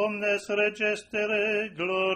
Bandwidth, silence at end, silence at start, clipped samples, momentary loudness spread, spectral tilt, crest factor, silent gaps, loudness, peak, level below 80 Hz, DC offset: 11 kHz; 0 s; 0 s; under 0.1%; 3 LU; -4 dB/octave; 16 dB; none; -27 LUFS; -12 dBFS; -68 dBFS; under 0.1%